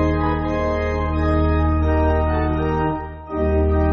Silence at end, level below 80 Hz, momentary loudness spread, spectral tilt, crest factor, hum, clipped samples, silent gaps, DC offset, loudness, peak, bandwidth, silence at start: 0 s; -24 dBFS; 5 LU; -7.5 dB/octave; 12 dB; none; under 0.1%; none; under 0.1%; -20 LUFS; -6 dBFS; 6.6 kHz; 0 s